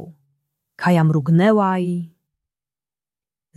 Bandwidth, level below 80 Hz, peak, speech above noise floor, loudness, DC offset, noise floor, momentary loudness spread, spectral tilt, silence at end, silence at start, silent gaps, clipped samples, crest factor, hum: 12 kHz; -64 dBFS; -4 dBFS; over 74 dB; -18 LUFS; under 0.1%; under -90 dBFS; 12 LU; -8.5 dB/octave; 1.5 s; 0 s; none; under 0.1%; 16 dB; none